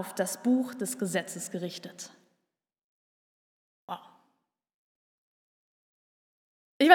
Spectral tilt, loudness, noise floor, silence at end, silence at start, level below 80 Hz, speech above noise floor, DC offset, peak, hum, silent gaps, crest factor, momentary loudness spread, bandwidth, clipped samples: -3.5 dB/octave; -32 LUFS; -84 dBFS; 0 s; 0 s; under -90 dBFS; 52 dB; under 0.1%; -2 dBFS; none; 2.84-3.88 s, 4.74-6.80 s; 28 dB; 16 LU; 18.5 kHz; under 0.1%